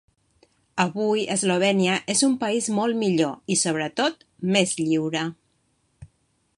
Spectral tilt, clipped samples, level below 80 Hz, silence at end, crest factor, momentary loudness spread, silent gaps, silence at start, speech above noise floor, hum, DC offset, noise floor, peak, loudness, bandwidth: -4 dB/octave; under 0.1%; -66 dBFS; 0.5 s; 18 dB; 6 LU; none; 0.75 s; 46 dB; none; under 0.1%; -68 dBFS; -6 dBFS; -23 LUFS; 11.5 kHz